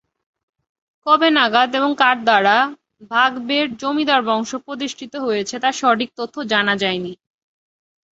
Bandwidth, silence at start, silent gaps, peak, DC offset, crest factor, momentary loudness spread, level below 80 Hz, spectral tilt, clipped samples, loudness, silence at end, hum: 8 kHz; 1.05 s; none; -2 dBFS; under 0.1%; 18 dB; 13 LU; -66 dBFS; -3.5 dB/octave; under 0.1%; -18 LUFS; 1 s; none